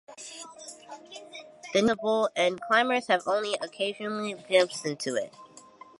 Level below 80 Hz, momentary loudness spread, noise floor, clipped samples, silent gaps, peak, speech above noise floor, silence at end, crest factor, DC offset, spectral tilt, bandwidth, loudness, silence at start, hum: -72 dBFS; 19 LU; -51 dBFS; under 0.1%; none; -8 dBFS; 24 dB; 0.4 s; 20 dB; under 0.1%; -3 dB/octave; 11.5 kHz; -27 LUFS; 0.1 s; none